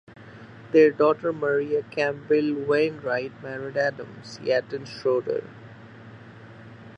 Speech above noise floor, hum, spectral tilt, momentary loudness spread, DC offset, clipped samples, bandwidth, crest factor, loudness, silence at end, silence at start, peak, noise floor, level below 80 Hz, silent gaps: 21 dB; none; -6.5 dB/octave; 26 LU; under 0.1%; under 0.1%; 8.2 kHz; 20 dB; -24 LUFS; 0 s; 0.1 s; -6 dBFS; -45 dBFS; -66 dBFS; none